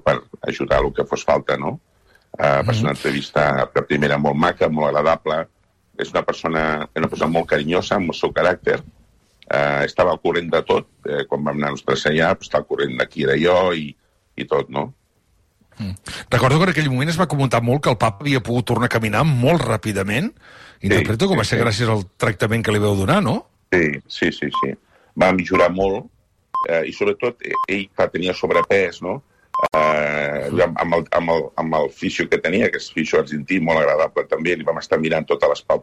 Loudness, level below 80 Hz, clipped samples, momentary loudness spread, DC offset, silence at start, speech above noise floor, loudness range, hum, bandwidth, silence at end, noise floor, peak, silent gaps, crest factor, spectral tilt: -19 LUFS; -44 dBFS; under 0.1%; 8 LU; under 0.1%; 0.05 s; 42 dB; 2 LU; none; 14.5 kHz; 0 s; -61 dBFS; -4 dBFS; none; 14 dB; -6 dB/octave